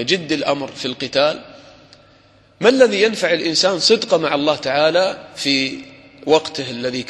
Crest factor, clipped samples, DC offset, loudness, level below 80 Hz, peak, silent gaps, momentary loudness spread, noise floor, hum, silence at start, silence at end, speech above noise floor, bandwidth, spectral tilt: 18 dB; under 0.1%; under 0.1%; -17 LUFS; -60 dBFS; 0 dBFS; none; 10 LU; -51 dBFS; none; 0 s; 0 s; 34 dB; 12.5 kHz; -3.5 dB/octave